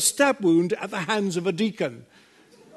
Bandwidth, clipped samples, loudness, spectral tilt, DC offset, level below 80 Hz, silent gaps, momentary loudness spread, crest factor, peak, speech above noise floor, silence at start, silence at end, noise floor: 12.5 kHz; under 0.1%; -24 LUFS; -4 dB/octave; under 0.1%; -74 dBFS; none; 9 LU; 18 dB; -6 dBFS; 30 dB; 0 s; 0.75 s; -53 dBFS